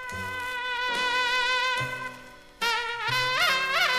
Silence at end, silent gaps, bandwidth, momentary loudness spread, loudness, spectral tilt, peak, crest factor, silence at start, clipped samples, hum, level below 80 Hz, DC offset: 0 s; none; 15.5 kHz; 10 LU; -26 LUFS; -1.5 dB/octave; -10 dBFS; 16 dB; 0 s; under 0.1%; none; -58 dBFS; under 0.1%